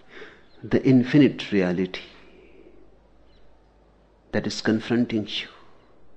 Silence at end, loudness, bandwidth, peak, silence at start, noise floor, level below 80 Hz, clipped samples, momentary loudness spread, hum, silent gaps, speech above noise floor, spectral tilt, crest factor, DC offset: 0 s; -23 LUFS; 8.4 kHz; -6 dBFS; 0.15 s; -57 dBFS; -58 dBFS; under 0.1%; 23 LU; none; none; 35 dB; -6.5 dB/octave; 20 dB; under 0.1%